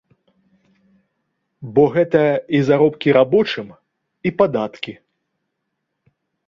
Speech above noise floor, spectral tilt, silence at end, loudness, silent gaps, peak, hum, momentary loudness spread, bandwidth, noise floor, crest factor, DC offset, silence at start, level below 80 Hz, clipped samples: 59 dB; -8 dB/octave; 1.55 s; -17 LUFS; none; 0 dBFS; none; 16 LU; 7 kHz; -76 dBFS; 18 dB; under 0.1%; 1.6 s; -58 dBFS; under 0.1%